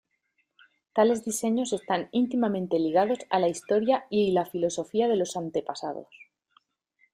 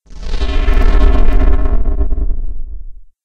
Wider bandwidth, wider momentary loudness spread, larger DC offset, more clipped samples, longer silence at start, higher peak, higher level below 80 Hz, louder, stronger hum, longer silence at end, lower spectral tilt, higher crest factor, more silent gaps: first, 15.5 kHz vs 5.6 kHz; second, 8 LU vs 15 LU; neither; neither; first, 0.95 s vs 0.1 s; second, -10 dBFS vs 0 dBFS; second, -70 dBFS vs -12 dBFS; second, -27 LUFS vs -17 LUFS; neither; first, 0.9 s vs 0.2 s; second, -5 dB/octave vs -7.5 dB/octave; first, 18 dB vs 10 dB; neither